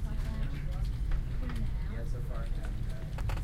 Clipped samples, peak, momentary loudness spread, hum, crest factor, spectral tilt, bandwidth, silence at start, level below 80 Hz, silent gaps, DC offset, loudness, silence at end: under 0.1%; -20 dBFS; 2 LU; none; 12 dB; -7 dB/octave; 13 kHz; 0 s; -34 dBFS; none; under 0.1%; -38 LUFS; 0 s